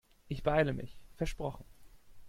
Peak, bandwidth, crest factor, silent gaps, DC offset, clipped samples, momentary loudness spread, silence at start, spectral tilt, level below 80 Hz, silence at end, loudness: -14 dBFS; 16 kHz; 22 dB; none; under 0.1%; under 0.1%; 17 LU; 0.25 s; -6.5 dB/octave; -48 dBFS; 0 s; -35 LUFS